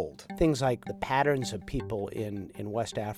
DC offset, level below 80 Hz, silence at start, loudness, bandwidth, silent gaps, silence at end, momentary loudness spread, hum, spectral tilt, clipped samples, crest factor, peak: under 0.1%; -48 dBFS; 0 s; -31 LUFS; 16 kHz; none; 0 s; 10 LU; none; -6 dB/octave; under 0.1%; 18 dB; -12 dBFS